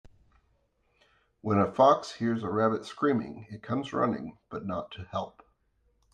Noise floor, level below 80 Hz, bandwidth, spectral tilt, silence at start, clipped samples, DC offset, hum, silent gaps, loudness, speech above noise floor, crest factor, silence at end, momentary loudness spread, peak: -71 dBFS; -66 dBFS; 9.8 kHz; -7 dB/octave; 1.45 s; under 0.1%; under 0.1%; none; none; -29 LUFS; 43 dB; 22 dB; 0.85 s; 17 LU; -10 dBFS